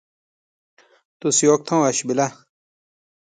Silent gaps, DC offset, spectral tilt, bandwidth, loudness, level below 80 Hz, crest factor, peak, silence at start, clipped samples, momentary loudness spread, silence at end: none; under 0.1%; -4 dB/octave; 9.6 kHz; -19 LUFS; -68 dBFS; 20 dB; -4 dBFS; 1.25 s; under 0.1%; 9 LU; 0.9 s